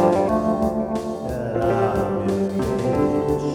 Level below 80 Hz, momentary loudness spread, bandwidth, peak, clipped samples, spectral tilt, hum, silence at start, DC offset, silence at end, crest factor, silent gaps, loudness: -40 dBFS; 6 LU; 16.5 kHz; -4 dBFS; under 0.1%; -7.5 dB/octave; none; 0 s; under 0.1%; 0 s; 16 dB; none; -22 LUFS